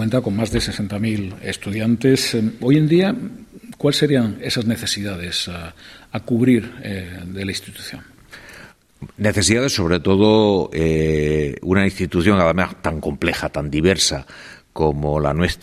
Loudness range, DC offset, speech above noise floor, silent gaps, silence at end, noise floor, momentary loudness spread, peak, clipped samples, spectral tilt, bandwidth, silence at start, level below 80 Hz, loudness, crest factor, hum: 6 LU; under 0.1%; 25 dB; none; 0.05 s; -44 dBFS; 16 LU; -2 dBFS; under 0.1%; -5 dB/octave; 15 kHz; 0 s; -40 dBFS; -19 LUFS; 16 dB; none